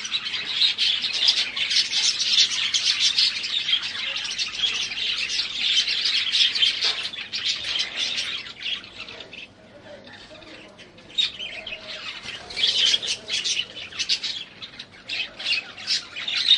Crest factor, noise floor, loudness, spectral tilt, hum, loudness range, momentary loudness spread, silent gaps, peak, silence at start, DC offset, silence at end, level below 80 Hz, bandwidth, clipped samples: 22 dB; -46 dBFS; -22 LUFS; 1.5 dB/octave; none; 11 LU; 17 LU; none; -4 dBFS; 0 s; under 0.1%; 0 s; -62 dBFS; 11.5 kHz; under 0.1%